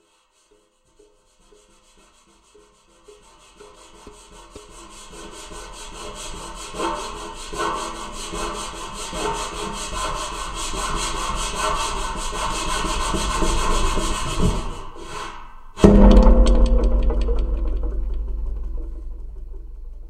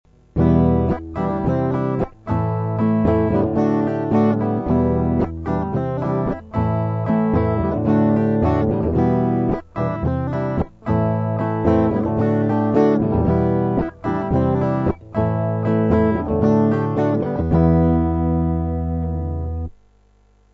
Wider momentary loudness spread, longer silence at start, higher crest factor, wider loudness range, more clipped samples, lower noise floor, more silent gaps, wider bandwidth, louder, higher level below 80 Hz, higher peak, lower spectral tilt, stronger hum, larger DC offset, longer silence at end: first, 23 LU vs 7 LU; first, 3.1 s vs 0.35 s; first, 22 dB vs 16 dB; first, 18 LU vs 2 LU; neither; first, -61 dBFS vs -55 dBFS; neither; first, 13 kHz vs 6 kHz; second, -23 LUFS vs -19 LUFS; first, -24 dBFS vs -34 dBFS; about the same, 0 dBFS vs -2 dBFS; second, -5 dB/octave vs -11 dB/octave; second, none vs 50 Hz at -50 dBFS; neither; second, 0 s vs 0.8 s